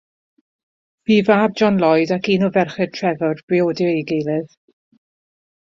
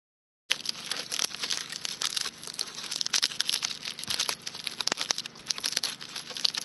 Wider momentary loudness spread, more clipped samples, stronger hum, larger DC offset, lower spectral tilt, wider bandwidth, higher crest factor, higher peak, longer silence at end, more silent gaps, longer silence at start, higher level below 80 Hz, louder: about the same, 8 LU vs 8 LU; neither; neither; neither; first, -7 dB/octave vs 1 dB/octave; second, 7.4 kHz vs 11 kHz; second, 18 dB vs 32 dB; about the same, -2 dBFS vs -2 dBFS; first, 1.3 s vs 0 s; first, 3.43-3.48 s vs none; first, 1.1 s vs 0.5 s; first, -60 dBFS vs -72 dBFS; first, -18 LUFS vs -30 LUFS